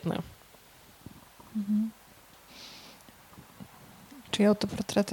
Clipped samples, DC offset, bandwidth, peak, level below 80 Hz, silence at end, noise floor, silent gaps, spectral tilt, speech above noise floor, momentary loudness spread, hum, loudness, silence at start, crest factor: under 0.1%; under 0.1%; 19 kHz; -12 dBFS; -62 dBFS; 0 s; -56 dBFS; none; -5.5 dB/octave; 28 dB; 28 LU; none; -30 LUFS; 0 s; 20 dB